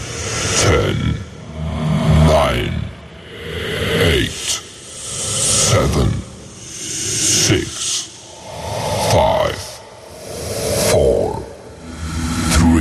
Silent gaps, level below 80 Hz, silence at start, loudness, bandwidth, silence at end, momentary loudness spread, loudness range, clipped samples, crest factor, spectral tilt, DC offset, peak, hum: none; -30 dBFS; 0 s; -17 LUFS; 13 kHz; 0 s; 19 LU; 3 LU; under 0.1%; 16 dB; -4 dB/octave; under 0.1%; -2 dBFS; none